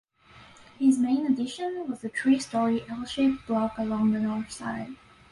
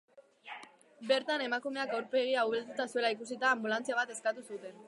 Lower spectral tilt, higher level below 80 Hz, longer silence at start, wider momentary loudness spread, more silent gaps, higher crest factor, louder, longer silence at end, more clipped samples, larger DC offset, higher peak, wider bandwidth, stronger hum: first, -5.5 dB/octave vs -2.5 dB/octave; first, -60 dBFS vs under -90 dBFS; first, 0.35 s vs 0.15 s; second, 10 LU vs 17 LU; neither; about the same, 16 dB vs 20 dB; first, -27 LUFS vs -33 LUFS; first, 0.35 s vs 0 s; neither; neither; first, -12 dBFS vs -16 dBFS; about the same, 11.5 kHz vs 11.5 kHz; neither